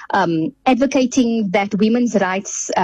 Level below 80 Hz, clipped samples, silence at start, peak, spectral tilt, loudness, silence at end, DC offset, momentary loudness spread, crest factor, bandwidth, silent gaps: -54 dBFS; under 0.1%; 0 s; -6 dBFS; -4.5 dB/octave; -17 LUFS; 0 s; under 0.1%; 4 LU; 10 dB; 8.8 kHz; none